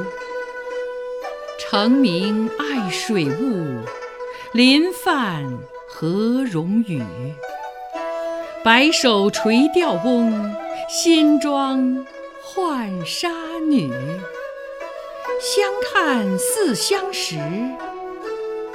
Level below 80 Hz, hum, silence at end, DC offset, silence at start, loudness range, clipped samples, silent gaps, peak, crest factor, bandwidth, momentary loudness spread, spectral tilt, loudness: -58 dBFS; none; 0 s; under 0.1%; 0 s; 6 LU; under 0.1%; none; 0 dBFS; 20 dB; 16.5 kHz; 16 LU; -4 dB/octave; -20 LUFS